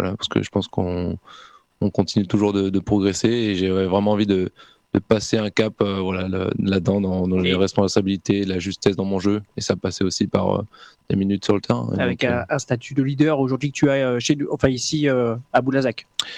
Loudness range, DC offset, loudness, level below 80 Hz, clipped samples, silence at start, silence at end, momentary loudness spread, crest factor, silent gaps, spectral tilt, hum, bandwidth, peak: 2 LU; under 0.1%; -21 LUFS; -50 dBFS; under 0.1%; 0 s; 0 s; 6 LU; 18 dB; none; -5.5 dB/octave; none; 11.5 kHz; -4 dBFS